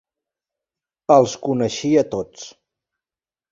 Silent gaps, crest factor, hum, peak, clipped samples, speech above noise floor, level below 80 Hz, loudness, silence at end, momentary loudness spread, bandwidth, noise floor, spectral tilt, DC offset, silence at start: none; 20 dB; none; -2 dBFS; under 0.1%; over 72 dB; -58 dBFS; -18 LUFS; 1.05 s; 20 LU; 7.8 kHz; under -90 dBFS; -5.5 dB/octave; under 0.1%; 1.1 s